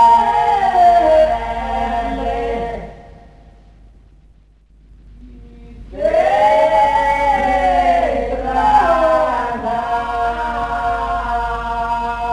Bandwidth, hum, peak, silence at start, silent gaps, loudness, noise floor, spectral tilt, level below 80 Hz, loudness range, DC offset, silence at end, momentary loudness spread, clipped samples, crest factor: 11 kHz; none; -2 dBFS; 0 s; none; -16 LUFS; -48 dBFS; -5.5 dB/octave; -32 dBFS; 12 LU; under 0.1%; 0 s; 9 LU; under 0.1%; 14 dB